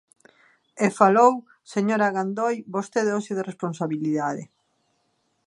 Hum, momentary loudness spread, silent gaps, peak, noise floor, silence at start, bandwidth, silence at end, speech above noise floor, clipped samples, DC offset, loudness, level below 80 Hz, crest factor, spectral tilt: none; 12 LU; none; -2 dBFS; -71 dBFS; 0.75 s; 11.5 kHz; 1.05 s; 48 dB; under 0.1%; under 0.1%; -23 LUFS; -78 dBFS; 22 dB; -6 dB/octave